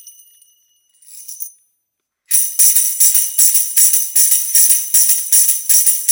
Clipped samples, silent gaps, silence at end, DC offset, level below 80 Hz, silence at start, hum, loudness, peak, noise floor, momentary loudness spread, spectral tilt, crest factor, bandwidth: under 0.1%; none; 0 s; under 0.1%; -74 dBFS; 0.05 s; none; -9 LUFS; 0 dBFS; -74 dBFS; 16 LU; 6.5 dB/octave; 14 dB; over 20 kHz